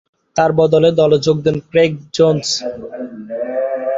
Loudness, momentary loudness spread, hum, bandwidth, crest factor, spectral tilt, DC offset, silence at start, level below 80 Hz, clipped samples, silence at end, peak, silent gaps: -15 LUFS; 15 LU; none; 7.8 kHz; 14 dB; -5.5 dB/octave; under 0.1%; 0.35 s; -52 dBFS; under 0.1%; 0 s; 0 dBFS; none